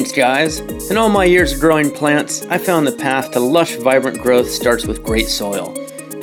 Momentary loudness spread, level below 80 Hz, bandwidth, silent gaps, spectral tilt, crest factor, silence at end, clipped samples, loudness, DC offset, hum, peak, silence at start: 7 LU; -34 dBFS; 19.5 kHz; none; -4 dB/octave; 14 dB; 0 s; under 0.1%; -15 LUFS; under 0.1%; none; -2 dBFS; 0 s